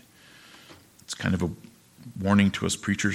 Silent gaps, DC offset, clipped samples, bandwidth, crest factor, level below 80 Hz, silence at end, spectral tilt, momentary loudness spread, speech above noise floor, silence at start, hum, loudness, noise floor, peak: none; under 0.1%; under 0.1%; 15 kHz; 22 dB; -54 dBFS; 0 s; -5 dB/octave; 22 LU; 28 dB; 0.7 s; none; -26 LUFS; -53 dBFS; -6 dBFS